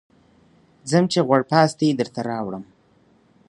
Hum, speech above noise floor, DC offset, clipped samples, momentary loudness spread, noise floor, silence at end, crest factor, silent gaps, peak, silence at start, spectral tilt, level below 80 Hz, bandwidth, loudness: none; 38 dB; under 0.1%; under 0.1%; 14 LU; -58 dBFS; 0.85 s; 22 dB; none; 0 dBFS; 0.85 s; -6 dB/octave; -64 dBFS; 11.5 kHz; -20 LUFS